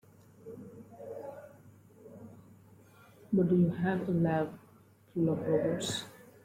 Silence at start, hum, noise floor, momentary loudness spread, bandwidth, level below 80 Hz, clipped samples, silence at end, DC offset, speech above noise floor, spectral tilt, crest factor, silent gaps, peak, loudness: 0.45 s; none; -61 dBFS; 24 LU; 15.5 kHz; -66 dBFS; under 0.1%; 0.25 s; under 0.1%; 31 dB; -6.5 dB/octave; 16 dB; none; -18 dBFS; -31 LUFS